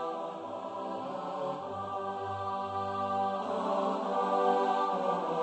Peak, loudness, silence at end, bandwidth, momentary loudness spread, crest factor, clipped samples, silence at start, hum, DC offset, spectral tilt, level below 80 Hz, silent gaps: -16 dBFS; -33 LUFS; 0 s; 8.4 kHz; 10 LU; 18 dB; under 0.1%; 0 s; none; under 0.1%; -6 dB/octave; -80 dBFS; none